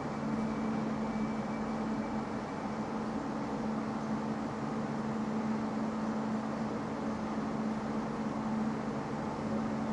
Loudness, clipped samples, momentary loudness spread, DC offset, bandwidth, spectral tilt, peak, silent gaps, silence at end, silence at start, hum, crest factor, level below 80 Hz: -36 LUFS; under 0.1%; 2 LU; under 0.1%; 10.5 kHz; -7 dB/octave; -22 dBFS; none; 0 s; 0 s; none; 12 dB; -60 dBFS